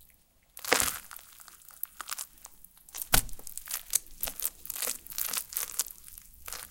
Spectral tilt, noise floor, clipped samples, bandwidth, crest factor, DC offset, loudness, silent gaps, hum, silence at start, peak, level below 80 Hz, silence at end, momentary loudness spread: -0.5 dB/octave; -64 dBFS; under 0.1%; 17 kHz; 32 dB; under 0.1%; -32 LUFS; none; none; 0 s; -4 dBFS; -48 dBFS; 0 s; 21 LU